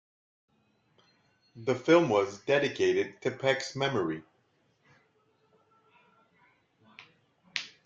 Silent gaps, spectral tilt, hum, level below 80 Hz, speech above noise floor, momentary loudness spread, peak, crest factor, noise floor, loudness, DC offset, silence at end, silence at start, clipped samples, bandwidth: none; -5 dB/octave; none; -74 dBFS; 43 dB; 14 LU; -8 dBFS; 24 dB; -71 dBFS; -29 LUFS; under 0.1%; 0.2 s; 1.55 s; under 0.1%; 7.8 kHz